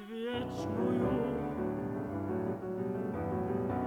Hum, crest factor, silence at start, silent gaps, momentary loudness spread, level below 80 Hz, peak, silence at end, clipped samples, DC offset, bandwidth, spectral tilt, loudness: none; 14 dB; 0 s; none; 6 LU; -56 dBFS; -20 dBFS; 0 s; under 0.1%; under 0.1%; 18.5 kHz; -8 dB/octave; -35 LUFS